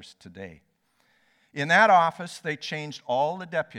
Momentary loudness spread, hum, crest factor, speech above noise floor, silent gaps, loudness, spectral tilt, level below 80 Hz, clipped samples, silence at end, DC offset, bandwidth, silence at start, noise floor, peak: 25 LU; none; 20 dB; 42 dB; none; -24 LUFS; -4.5 dB/octave; -74 dBFS; under 0.1%; 0 s; under 0.1%; 12.5 kHz; 0.25 s; -68 dBFS; -6 dBFS